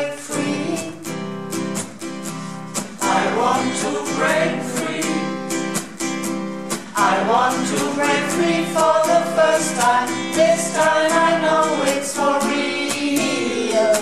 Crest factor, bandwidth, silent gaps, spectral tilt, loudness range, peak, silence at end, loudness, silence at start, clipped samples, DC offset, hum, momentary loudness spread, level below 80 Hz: 14 dB; 15 kHz; none; -3.5 dB/octave; 6 LU; -4 dBFS; 0 s; -19 LUFS; 0 s; under 0.1%; 0.6%; none; 11 LU; -60 dBFS